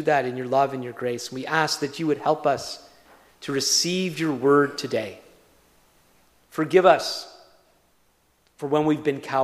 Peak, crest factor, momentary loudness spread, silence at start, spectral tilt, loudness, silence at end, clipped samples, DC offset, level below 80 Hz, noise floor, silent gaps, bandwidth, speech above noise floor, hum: -2 dBFS; 22 dB; 15 LU; 0 s; -4 dB/octave; -23 LUFS; 0 s; under 0.1%; under 0.1%; -68 dBFS; -64 dBFS; none; 15.5 kHz; 41 dB; none